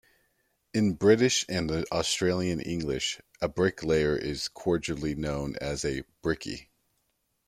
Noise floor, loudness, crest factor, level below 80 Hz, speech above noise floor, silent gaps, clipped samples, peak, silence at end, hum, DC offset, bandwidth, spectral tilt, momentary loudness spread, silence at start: -76 dBFS; -28 LUFS; 20 dB; -50 dBFS; 48 dB; none; under 0.1%; -8 dBFS; 0.85 s; none; under 0.1%; 15 kHz; -4.5 dB/octave; 10 LU; 0.75 s